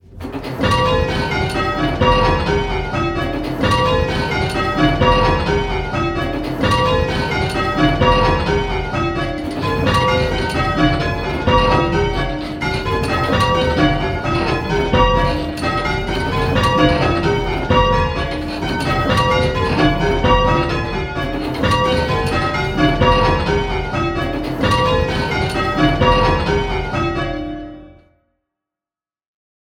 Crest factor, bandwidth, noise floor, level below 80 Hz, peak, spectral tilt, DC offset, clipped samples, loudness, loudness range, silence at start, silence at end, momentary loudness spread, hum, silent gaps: 16 dB; 16.5 kHz; under -90 dBFS; -26 dBFS; 0 dBFS; -6 dB/octave; under 0.1%; under 0.1%; -17 LUFS; 1 LU; 0.1 s; 1.85 s; 7 LU; none; none